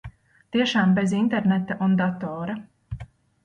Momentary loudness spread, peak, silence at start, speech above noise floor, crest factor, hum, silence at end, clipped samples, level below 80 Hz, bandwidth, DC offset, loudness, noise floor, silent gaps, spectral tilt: 18 LU; -8 dBFS; 0.05 s; 22 dB; 16 dB; none; 0.4 s; under 0.1%; -52 dBFS; 9.6 kHz; under 0.1%; -23 LUFS; -44 dBFS; none; -6.5 dB/octave